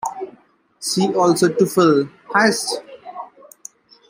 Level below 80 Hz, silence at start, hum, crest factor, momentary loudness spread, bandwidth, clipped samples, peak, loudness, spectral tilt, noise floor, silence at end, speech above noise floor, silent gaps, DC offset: -66 dBFS; 0.05 s; none; 18 dB; 23 LU; 16 kHz; under 0.1%; -2 dBFS; -18 LUFS; -4.5 dB/octave; -52 dBFS; 0.85 s; 36 dB; none; under 0.1%